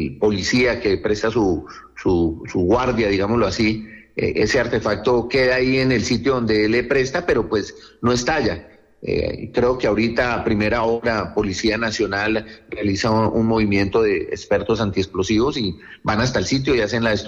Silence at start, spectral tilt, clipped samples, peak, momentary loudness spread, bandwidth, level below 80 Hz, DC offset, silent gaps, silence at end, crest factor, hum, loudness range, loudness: 0 s; -5.5 dB/octave; under 0.1%; -8 dBFS; 7 LU; 8.2 kHz; -40 dBFS; under 0.1%; none; 0 s; 12 dB; none; 2 LU; -20 LUFS